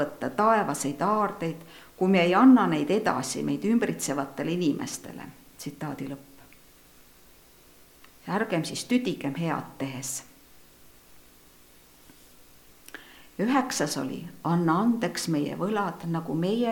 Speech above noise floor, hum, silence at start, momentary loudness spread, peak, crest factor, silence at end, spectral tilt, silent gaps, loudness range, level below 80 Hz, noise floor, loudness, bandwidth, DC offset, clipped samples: 29 dB; none; 0 s; 18 LU; -8 dBFS; 20 dB; 0 s; -5 dB/octave; none; 15 LU; -64 dBFS; -55 dBFS; -26 LUFS; 19 kHz; under 0.1%; under 0.1%